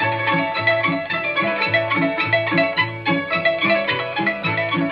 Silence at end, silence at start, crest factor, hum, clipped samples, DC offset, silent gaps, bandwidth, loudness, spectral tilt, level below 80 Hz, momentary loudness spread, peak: 0 s; 0 s; 16 dB; none; under 0.1%; under 0.1%; none; 5.6 kHz; -19 LUFS; -7.5 dB/octave; -58 dBFS; 3 LU; -4 dBFS